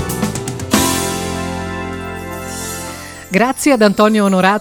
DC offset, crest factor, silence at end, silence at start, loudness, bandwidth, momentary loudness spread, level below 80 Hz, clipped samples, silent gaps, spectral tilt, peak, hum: under 0.1%; 16 dB; 0 s; 0 s; -16 LUFS; 19.5 kHz; 14 LU; -40 dBFS; under 0.1%; none; -4.5 dB/octave; 0 dBFS; none